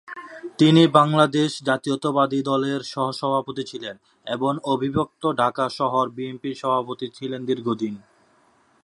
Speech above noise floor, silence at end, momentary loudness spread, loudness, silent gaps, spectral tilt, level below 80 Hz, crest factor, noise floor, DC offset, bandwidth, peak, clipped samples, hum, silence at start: 38 dB; 0.85 s; 15 LU; -22 LUFS; none; -6 dB/octave; -60 dBFS; 22 dB; -60 dBFS; under 0.1%; 11.5 kHz; 0 dBFS; under 0.1%; none; 0.1 s